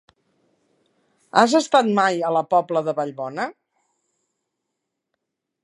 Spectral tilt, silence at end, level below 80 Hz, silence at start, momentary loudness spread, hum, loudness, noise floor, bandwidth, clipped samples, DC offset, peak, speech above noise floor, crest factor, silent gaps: -4.5 dB/octave; 2.15 s; -78 dBFS; 1.35 s; 11 LU; none; -20 LUFS; -80 dBFS; 11 kHz; under 0.1%; under 0.1%; 0 dBFS; 61 dB; 22 dB; none